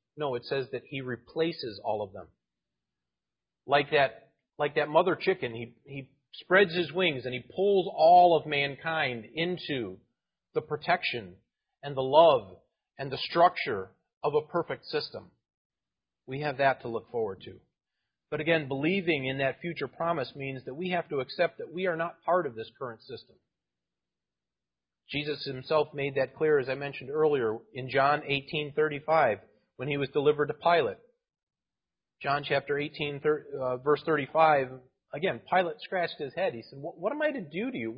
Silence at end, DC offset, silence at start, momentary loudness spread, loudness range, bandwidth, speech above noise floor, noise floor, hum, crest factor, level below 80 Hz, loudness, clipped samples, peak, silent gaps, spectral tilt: 0 s; under 0.1%; 0.15 s; 14 LU; 8 LU; 5.4 kHz; over 61 dB; under -90 dBFS; none; 22 dB; -68 dBFS; -29 LUFS; under 0.1%; -8 dBFS; 14.17-14.21 s, 15.57-15.70 s, 31.43-31.47 s; -9.5 dB/octave